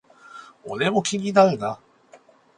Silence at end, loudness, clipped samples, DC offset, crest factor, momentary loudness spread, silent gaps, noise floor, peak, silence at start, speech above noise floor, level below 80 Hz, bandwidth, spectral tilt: 0.8 s; -21 LUFS; under 0.1%; under 0.1%; 22 dB; 24 LU; none; -53 dBFS; -2 dBFS; 0.35 s; 32 dB; -66 dBFS; 10.5 kHz; -4.5 dB/octave